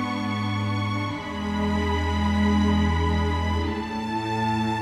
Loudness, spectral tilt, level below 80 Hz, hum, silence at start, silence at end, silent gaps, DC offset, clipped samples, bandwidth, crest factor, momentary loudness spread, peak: -25 LUFS; -6.5 dB/octave; -34 dBFS; none; 0 s; 0 s; none; under 0.1%; under 0.1%; 11.5 kHz; 14 dB; 7 LU; -10 dBFS